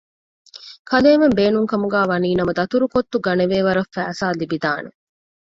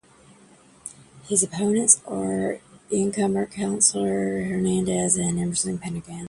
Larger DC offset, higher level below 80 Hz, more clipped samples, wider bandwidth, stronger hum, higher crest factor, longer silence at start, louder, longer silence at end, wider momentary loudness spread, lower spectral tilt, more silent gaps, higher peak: neither; about the same, -52 dBFS vs -54 dBFS; neither; second, 7.8 kHz vs 11.5 kHz; neither; second, 18 dB vs 24 dB; second, 0.55 s vs 0.85 s; first, -18 LUFS vs -22 LUFS; first, 0.6 s vs 0 s; about the same, 12 LU vs 14 LU; first, -6.5 dB/octave vs -4 dB/octave; first, 0.79-0.85 s vs none; about the same, -2 dBFS vs 0 dBFS